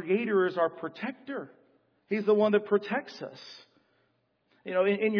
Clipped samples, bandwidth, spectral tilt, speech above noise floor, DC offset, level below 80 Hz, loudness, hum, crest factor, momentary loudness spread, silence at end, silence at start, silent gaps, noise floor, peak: under 0.1%; 5.4 kHz; -7.5 dB/octave; 45 dB; under 0.1%; -88 dBFS; -29 LUFS; none; 18 dB; 21 LU; 0 s; 0 s; none; -73 dBFS; -12 dBFS